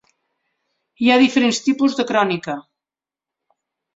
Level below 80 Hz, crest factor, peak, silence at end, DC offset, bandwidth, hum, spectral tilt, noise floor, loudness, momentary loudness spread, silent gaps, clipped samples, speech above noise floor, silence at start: -64 dBFS; 18 dB; -2 dBFS; 1.35 s; under 0.1%; 7.8 kHz; none; -4 dB/octave; -89 dBFS; -17 LUFS; 12 LU; none; under 0.1%; 73 dB; 1 s